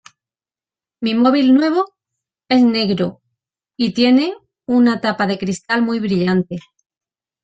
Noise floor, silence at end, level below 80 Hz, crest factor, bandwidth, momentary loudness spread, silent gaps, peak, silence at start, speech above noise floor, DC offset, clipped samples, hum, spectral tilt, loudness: under -90 dBFS; 0.85 s; -58 dBFS; 16 dB; 8.2 kHz; 11 LU; none; -2 dBFS; 1 s; over 75 dB; under 0.1%; under 0.1%; none; -6 dB/octave; -16 LUFS